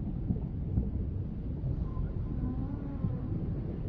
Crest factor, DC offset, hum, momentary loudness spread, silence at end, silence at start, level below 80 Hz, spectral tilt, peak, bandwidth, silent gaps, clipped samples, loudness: 16 dB; under 0.1%; none; 3 LU; 0 s; 0 s; -38 dBFS; -11.5 dB/octave; -16 dBFS; 4.4 kHz; none; under 0.1%; -36 LUFS